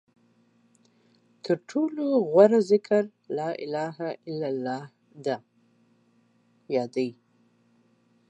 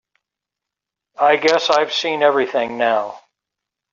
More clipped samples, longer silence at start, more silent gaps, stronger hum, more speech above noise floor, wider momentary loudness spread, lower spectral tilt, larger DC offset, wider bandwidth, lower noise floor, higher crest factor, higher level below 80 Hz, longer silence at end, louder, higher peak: neither; first, 1.45 s vs 1.2 s; neither; neither; second, 40 dB vs 68 dB; first, 16 LU vs 6 LU; first, -7 dB/octave vs 0 dB/octave; neither; first, 8.8 kHz vs 7.6 kHz; second, -65 dBFS vs -85 dBFS; first, 24 dB vs 16 dB; second, -84 dBFS vs -68 dBFS; first, 1.15 s vs 0.75 s; second, -26 LUFS vs -17 LUFS; about the same, -4 dBFS vs -2 dBFS